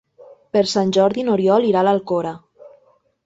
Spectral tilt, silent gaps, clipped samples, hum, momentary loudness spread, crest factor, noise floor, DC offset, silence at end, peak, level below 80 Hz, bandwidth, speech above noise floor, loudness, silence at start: -6 dB/octave; none; under 0.1%; none; 8 LU; 16 dB; -57 dBFS; under 0.1%; 0.55 s; -4 dBFS; -62 dBFS; 8 kHz; 41 dB; -18 LUFS; 0.2 s